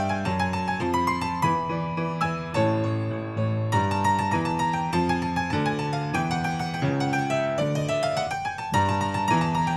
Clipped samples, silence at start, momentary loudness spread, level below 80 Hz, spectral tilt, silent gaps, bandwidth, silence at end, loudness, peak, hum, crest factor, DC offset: under 0.1%; 0 s; 4 LU; -52 dBFS; -6 dB/octave; none; 14 kHz; 0 s; -25 LUFS; -10 dBFS; none; 14 dB; under 0.1%